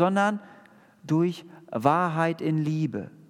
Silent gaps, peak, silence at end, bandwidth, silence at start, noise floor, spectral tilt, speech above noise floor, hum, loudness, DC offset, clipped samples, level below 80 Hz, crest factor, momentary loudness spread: none; -6 dBFS; 0.2 s; 13 kHz; 0 s; -54 dBFS; -7.5 dB/octave; 29 dB; none; -26 LUFS; under 0.1%; under 0.1%; -78 dBFS; 20 dB; 11 LU